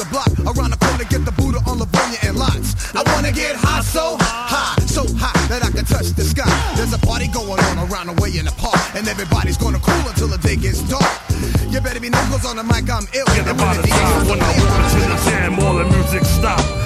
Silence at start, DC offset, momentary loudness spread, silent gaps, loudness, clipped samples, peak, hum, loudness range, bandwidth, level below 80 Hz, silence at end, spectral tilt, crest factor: 0 s; under 0.1%; 5 LU; none; -17 LUFS; under 0.1%; -2 dBFS; none; 3 LU; 15.5 kHz; -22 dBFS; 0 s; -5 dB/octave; 16 dB